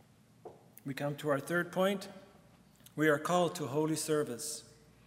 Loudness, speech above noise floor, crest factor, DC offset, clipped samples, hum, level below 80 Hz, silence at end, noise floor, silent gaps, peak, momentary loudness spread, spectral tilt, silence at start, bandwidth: -34 LUFS; 28 dB; 20 dB; under 0.1%; under 0.1%; none; -76 dBFS; 0.4 s; -61 dBFS; none; -16 dBFS; 18 LU; -4.5 dB/octave; 0.45 s; 16 kHz